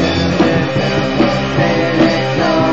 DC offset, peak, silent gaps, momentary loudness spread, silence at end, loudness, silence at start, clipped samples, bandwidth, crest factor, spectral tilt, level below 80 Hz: 2%; -2 dBFS; none; 2 LU; 0 s; -14 LUFS; 0 s; under 0.1%; 7.8 kHz; 12 dB; -6 dB/octave; -36 dBFS